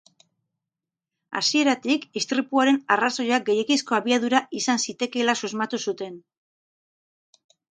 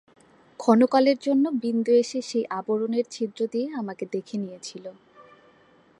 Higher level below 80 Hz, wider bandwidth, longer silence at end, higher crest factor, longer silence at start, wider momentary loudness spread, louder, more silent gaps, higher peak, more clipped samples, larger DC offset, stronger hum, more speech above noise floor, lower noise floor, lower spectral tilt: about the same, -76 dBFS vs -78 dBFS; second, 9.4 kHz vs 11 kHz; first, 1.6 s vs 0.8 s; about the same, 22 dB vs 22 dB; first, 1.3 s vs 0.6 s; second, 7 LU vs 15 LU; about the same, -23 LUFS vs -24 LUFS; neither; about the same, -4 dBFS vs -4 dBFS; neither; neither; neither; first, 65 dB vs 34 dB; first, -88 dBFS vs -58 dBFS; second, -2.5 dB/octave vs -5.5 dB/octave